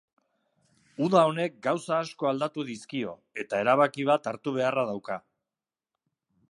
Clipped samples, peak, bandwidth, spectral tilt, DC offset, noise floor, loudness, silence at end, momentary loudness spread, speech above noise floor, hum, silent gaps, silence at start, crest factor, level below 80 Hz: under 0.1%; -6 dBFS; 11.5 kHz; -6 dB/octave; under 0.1%; under -90 dBFS; -27 LUFS; 1.3 s; 13 LU; over 63 dB; none; none; 1 s; 22 dB; -78 dBFS